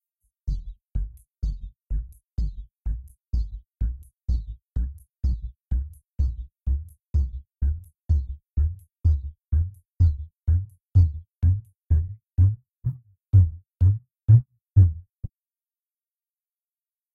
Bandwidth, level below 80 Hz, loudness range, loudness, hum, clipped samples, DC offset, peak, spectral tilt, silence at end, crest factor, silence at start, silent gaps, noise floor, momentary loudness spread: 1.7 kHz; -30 dBFS; 11 LU; -26 LUFS; none; under 0.1%; under 0.1%; -6 dBFS; -10 dB/octave; 1.85 s; 18 dB; 0.45 s; none; under -90 dBFS; 16 LU